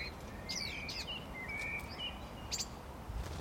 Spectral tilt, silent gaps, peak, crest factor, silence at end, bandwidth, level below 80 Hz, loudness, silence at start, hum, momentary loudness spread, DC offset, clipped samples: -2.5 dB/octave; none; -24 dBFS; 18 dB; 0 s; 16.5 kHz; -50 dBFS; -41 LUFS; 0 s; none; 8 LU; under 0.1%; under 0.1%